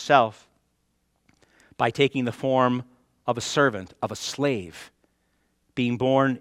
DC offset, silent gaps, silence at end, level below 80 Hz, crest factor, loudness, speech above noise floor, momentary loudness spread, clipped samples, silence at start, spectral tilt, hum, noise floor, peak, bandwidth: under 0.1%; none; 0 s; -64 dBFS; 24 dB; -25 LUFS; 48 dB; 11 LU; under 0.1%; 0 s; -5 dB/octave; none; -71 dBFS; -2 dBFS; 15 kHz